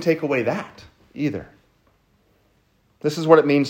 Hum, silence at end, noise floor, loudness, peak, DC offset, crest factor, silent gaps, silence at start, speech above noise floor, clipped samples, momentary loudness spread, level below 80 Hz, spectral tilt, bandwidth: none; 0 s; -62 dBFS; -21 LUFS; 0 dBFS; under 0.1%; 22 dB; none; 0 s; 43 dB; under 0.1%; 20 LU; -62 dBFS; -6.5 dB/octave; 16 kHz